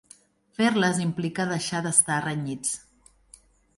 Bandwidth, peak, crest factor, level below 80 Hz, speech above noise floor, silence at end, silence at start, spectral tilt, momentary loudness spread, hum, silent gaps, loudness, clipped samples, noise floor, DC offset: 11.5 kHz; -4 dBFS; 22 dB; -64 dBFS; 31 dB; 1 s; 0.6 s; -3.5 dB/octave; 10 LU; none; none; -25 LUFS; under 0.1%; -56 dBFS; under 0.1%